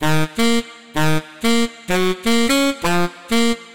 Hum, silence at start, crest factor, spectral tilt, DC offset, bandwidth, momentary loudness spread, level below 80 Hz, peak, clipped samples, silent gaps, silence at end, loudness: none; 0 s; 12 dB; -4.5 dB/octave; 4%; 17 kHz; 5 LU; -42 dBFS; -6 dBFS; under 0.1%; none; 0 s; -19 LUFS